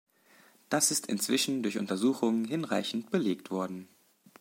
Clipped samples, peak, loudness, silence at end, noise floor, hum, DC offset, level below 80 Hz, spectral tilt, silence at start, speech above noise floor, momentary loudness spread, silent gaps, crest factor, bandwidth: under 0.1%; -12 dBFS; -30 LUFS; 0.55 s; -62 dBFS; none; under 0.1%; -82 dBFS; -3.5 dB/octave; 0.7 s; 31 dB; 8 LU; none; 18 dB; 16.5 kHz